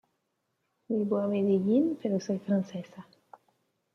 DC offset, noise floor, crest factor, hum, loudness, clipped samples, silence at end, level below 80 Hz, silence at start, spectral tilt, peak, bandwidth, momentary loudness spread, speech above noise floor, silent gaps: under 0.1%; -79 dBFS; 16 dB; none; -29 LUFS; under 0.1%; 0.9 s; -76 dBFS; 0.9 s; -8.5 dB/octave; -14 dBFS; 6.6 kHz; 13 LU; 51 dB; none